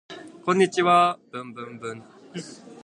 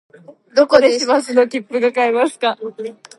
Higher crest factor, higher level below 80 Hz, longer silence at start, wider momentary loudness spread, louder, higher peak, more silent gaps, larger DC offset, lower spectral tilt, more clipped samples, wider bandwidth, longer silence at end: about the same, 18 dB vs 16 dB; second, -74 dBFS vs -60 dBFS; second, 0.1 s vs 0.3 s; first, 22 LU vs 12 LU; second, -21 LUFS vs -15 LUFS; second, -6 dBFS vs 0 dBFS; neither; neither; first, -5 dB/octave vs -3 dB/octave; neither; about the same, 11 kHz vs 11.5 kHz; second, 0.1 s vs 0.25 s